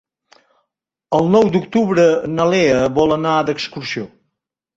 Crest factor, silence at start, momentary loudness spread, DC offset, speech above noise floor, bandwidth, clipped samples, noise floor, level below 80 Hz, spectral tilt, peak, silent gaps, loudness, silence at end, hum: 16 dB; 1.1 s; 11 LU; under 0.1%; 62 dB; 8 kHz; under 0.1%; -77 dBFS; -50 dBFS; -6 dB/octave; -2 dBFS; none; -16 LUFS; 0.7 s; none